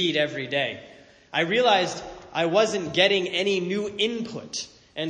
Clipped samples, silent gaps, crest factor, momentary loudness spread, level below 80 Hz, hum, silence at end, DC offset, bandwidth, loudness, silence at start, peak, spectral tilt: under 0.1%; none; 20 dB; 13 LU; -62 dBFS; none; 0 s; under 0.1%; 9.8 kHz; -24 LUFS; 0 s; -4 dBFS; -3.5 dB/octave